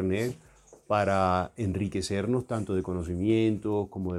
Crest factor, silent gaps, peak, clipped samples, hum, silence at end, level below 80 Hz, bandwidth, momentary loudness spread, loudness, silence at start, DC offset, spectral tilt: 16 dB; none; -12 dBFS; under 0.1%; none; 0 s; -52 dBFS; 13 kHz; 6 LU; -29 LUFS; 0 s; under 0.1%; -6.5 dB/octave